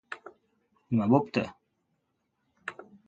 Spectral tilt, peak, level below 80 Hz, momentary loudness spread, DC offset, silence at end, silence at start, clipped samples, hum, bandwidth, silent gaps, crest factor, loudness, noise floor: -8 dB/octave; -8 dBFS; -66 dBFS; 19 LU; under 0.1%; 0.25 s; 0.1 s; under 0.1%; none; 8.4 kHz; none; 24 dB; -28 LUFS; -78 dBFS